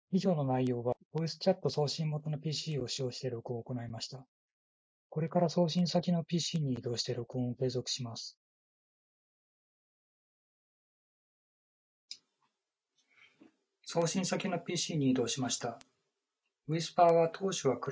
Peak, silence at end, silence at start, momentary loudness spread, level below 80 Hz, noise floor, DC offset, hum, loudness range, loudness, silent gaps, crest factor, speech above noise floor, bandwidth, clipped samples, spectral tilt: -12 dBFS; 0 s; 0.1 s; 13 LU; -72 dBFS; -88 dBFS; under 0.1%; none; 9 LU; -33 LUFS; 1.05-1.11 s, 4.28-5.10 s, 8.37-12.08 s; 22 dB; 55 dB; 8 kHz; under 0.1%; -5.5 dB/octave